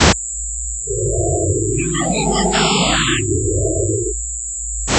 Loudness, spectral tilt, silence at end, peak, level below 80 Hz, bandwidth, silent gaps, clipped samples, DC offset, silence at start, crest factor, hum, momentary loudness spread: -17 LUFS; -3.5 dB/octave; 0 s; 0 dBFS; -28 dBFS; 8.4 kHz; none; under 0.1%; under 0.1%; 0 s; 18 dB; none; 8 LU